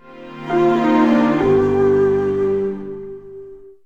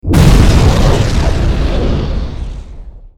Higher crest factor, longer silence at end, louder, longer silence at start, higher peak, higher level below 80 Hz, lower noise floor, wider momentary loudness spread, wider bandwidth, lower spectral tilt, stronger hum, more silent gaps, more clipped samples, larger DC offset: about the same, 14 dB vs 10 dB; about the same, 0.15 s vs 0.1 s; second, -16 LUFS vs -12 LUFS; about the same, 0.1 s vs 0.05 s; second, -4 dBFS vs 0 dBFS; second, -46 dBFS vs -14 dBFS; first, -38 dBFS vs -29 dBFS; first, 20 LU vs 17 LU; second, 7.4 kHz vs 17 kHz; first, -8 dB/octave vs -6.5 dB/octave; neither; neither; neither; first, 0.3% vs under 0.1%